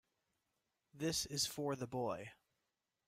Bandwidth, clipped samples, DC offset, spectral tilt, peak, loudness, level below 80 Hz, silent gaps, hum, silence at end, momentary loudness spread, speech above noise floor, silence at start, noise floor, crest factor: 16 kHz; under 0.1%; under 0.1%; -3.5 dB/octave; -26 dBFS; -41 LUFS; -72 dBFS; none; none; 0.75 s; 8 LU; 47 dB; 0.95 s; -89 dBFS; 20 dB